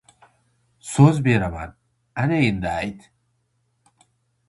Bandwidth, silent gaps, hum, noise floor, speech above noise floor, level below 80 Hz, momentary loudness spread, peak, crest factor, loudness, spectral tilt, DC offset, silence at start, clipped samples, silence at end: 11.5 kHz; none; none; -69 dBFS; 50 dB; -46 dBFS; 19 LU; 0 dBFS; 22 dB; -20 LUFS; -7 dB/octave; under 0.1%; 0.85 s; under 0.1%; 1.5 s